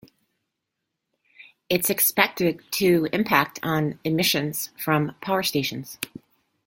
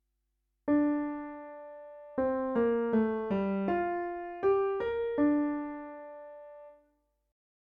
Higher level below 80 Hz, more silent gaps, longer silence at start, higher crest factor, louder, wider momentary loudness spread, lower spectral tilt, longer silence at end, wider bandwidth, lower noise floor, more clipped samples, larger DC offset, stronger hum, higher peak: about the same, -62 dBFS vs -62 dBFS; neither; first, 1.4 s vs 0.65 s; first, 24 dB vs 16 dB; first, -23 LUFS vs -31 LUFS; second, 10 LU vs 19 LU; second, -4 dB/octave vs -10 dB/octave; second, 0.6 s vs 1.05 s; first, 17 kHz vs 4.3 kHz; about the same, -82 dBFS vs -80 dBFS; neither; neither; neither; first, 0 dBFS vs -18 dBFS